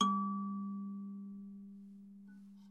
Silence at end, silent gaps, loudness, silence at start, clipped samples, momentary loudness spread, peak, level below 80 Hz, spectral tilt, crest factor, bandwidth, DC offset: 0 s; none; -41 LUFS; 0 s; under 0.1%; 19 LU; -18 dBFS; -88 dBFS; -5.5 dB/octave; 24 dB; 8.2 kHz; under 0.1%